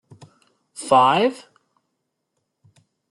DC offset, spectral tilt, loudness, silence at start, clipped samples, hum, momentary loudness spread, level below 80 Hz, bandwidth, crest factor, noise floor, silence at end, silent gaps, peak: under 0.1%; -4 dB/octave; -17 LUFS; 0.8 s; under 0.1%; none; 26 LU; -72 dBFS; 12 kHz; 22 dB; -77 dBFS; 1.75 s; none; -2 dBFS